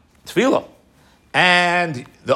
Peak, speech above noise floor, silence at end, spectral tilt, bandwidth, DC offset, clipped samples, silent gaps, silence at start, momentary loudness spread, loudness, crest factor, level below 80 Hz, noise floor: 0 dBFS; 36 dB; 0 s; -4 dB/octave; 16 kHz; under 0.1%; under 0.1%; none; 0.25 s; 11 LU; -17 LUFS; 20 dB; -60 dBFS; -53 dBFS